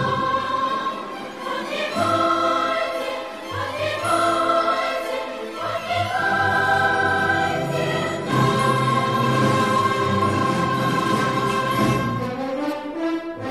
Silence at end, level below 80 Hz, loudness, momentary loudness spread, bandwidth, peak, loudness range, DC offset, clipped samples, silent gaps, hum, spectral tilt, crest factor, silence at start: 0 s; -54 dBFS; -21 LUFS; 9 LU; 14.5 kHz; -6 dBFS; 3 LU; 0.2%; under 0.1%; none; none; -5 dB/octave; 16 dB; 0 s